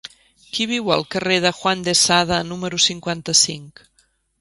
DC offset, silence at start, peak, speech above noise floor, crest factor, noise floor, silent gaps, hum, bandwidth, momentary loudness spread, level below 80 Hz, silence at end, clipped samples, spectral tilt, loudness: under 0.1%; 0.05 s; 0 dBFS; 23 dB; 20 dB; -43 dBFS; none; none; 11.5 kHz; 10 LU; -52 dBFS; 0.7 s; under 0.1%; -2 dB/octave; -18 LUFS